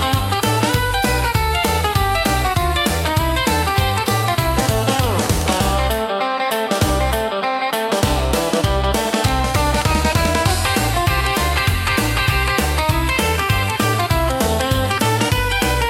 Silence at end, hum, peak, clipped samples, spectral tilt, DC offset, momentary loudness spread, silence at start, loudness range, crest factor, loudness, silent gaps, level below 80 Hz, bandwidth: 0 s; none; -2 dBFS; under 0.1%; -4.5 dB/octave; under 0.1%; 2 LU; 0 s; 1 LU; 14 dB; -17 LUFS; none; -26 dBFS; 17 kHz